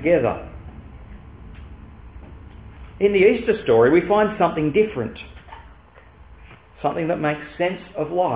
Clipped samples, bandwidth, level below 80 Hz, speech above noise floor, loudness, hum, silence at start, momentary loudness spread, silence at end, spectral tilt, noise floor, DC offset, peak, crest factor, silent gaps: under 0.1%; 4 kHz; -44 dBFS; 28 dB; -20 LUFS; none; 0 s; 26 LU; 0 s; -10.5 dB/octave; -47 dBFS; 0.1%; -4 dBFS; 18 dB; none